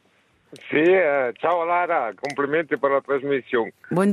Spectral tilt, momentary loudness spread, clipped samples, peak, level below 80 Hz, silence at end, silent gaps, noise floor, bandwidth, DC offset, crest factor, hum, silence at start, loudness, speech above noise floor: -6.5 dB/octave; 8 LU; under 0.1%; -6 dBFS; -70 dBFS; 0 s; none; -62 dBFS; 12 kHz; under 0.1%; 16 dB; none; 0.55 s; -22 LUFS; 40 dB